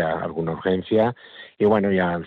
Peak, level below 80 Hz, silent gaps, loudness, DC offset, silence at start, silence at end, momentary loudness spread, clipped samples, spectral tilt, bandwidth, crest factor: -6 dBFS; -54 dBFS; none; -22 LUFS; under 0.1%; 0 s; 0 s; 10 LU; under 0.1%; -9.5 dB/octave; 4.6 kHz; 16 dB